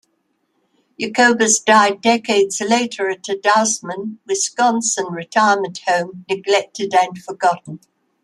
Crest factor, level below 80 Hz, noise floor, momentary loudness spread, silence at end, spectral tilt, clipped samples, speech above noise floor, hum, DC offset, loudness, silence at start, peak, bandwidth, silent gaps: 16 dB; -70 dBFS; -67 dBFS; 11 LU; 0.45 s; -2 dB/octave; under 0.1%; 50 dB; none; under 0.1%; -17 LUFS; 1 s; -2 dBFS; 12.5 kHz; none